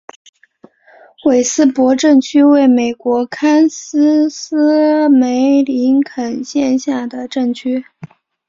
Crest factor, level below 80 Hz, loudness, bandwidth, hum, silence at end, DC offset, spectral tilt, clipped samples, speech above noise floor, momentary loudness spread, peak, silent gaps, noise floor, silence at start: 12 dB; -60 dBFS; -13 LUFS; 7.6 kHz; none; 0.4 s; under 0.1%; -4 dB/octave; under 0.1%; 34 dB; 10 LU; -2 dBFS; none; -47 dBFS; 1.25 s